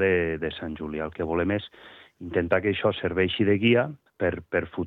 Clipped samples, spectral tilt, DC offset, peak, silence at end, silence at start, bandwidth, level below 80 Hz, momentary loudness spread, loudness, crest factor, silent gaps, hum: under 0.1%; -9 dB/octave; under 0.1%; -8 dBFS; 0 s; 0 s; 4.5 kHz; -56 dBFS; 11 LU; -26 LUFS; 18 dB; none; none